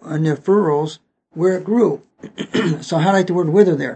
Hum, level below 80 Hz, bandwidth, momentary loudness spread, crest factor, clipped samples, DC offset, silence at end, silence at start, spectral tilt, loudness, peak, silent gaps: none; -66 dBFS; 8.6 kHz; 14 LU; 18 dB; under 0.1%; under 0.1%; 0 s; 0.05 s; -7 dB/octave; -17 LUFS; 0 dBFS; none